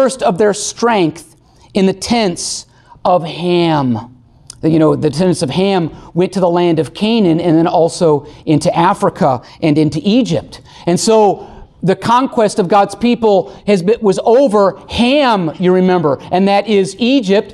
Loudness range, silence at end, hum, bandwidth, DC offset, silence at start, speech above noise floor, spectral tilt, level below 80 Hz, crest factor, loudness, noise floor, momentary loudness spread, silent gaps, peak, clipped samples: 3 LU; 0 s; none; 12.5 kHz; under 0.1%; 0 s; 27 dB; -5.5 dB/octave; -46 dBFS; 12 dB; -13 LUFS; -39 dBFS; 6 LU; none; -2 dBFS; under 0.1%